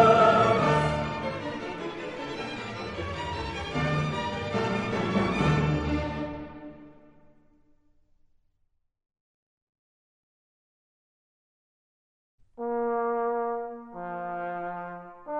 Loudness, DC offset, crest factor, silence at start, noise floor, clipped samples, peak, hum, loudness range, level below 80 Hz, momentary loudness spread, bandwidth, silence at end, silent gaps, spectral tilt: -28 LUFS; under 0.1%; 22 dB; 0 s; -73 dBFS; under 0.1%; -8 dBFS; none; 10 LU; -48 dBFS; 15 LU; 10.5 kHz; 0 s; 9.21-9.73 s, 9.79-12.38 s; -6.5 dB/octave